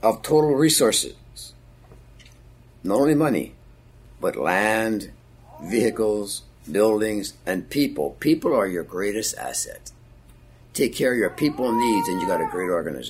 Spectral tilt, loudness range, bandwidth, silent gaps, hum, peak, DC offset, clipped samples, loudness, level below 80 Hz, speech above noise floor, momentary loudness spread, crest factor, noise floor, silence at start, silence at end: -4 dB/octave; 3 LU; 16 kHz; none; none; -4 dBFS; under 0.1%; under 0.1%; -22 LUFS; -52 dBFS; 27 dB; 14 LU; 18 dB; -49 dBFS; 0 s; 0 s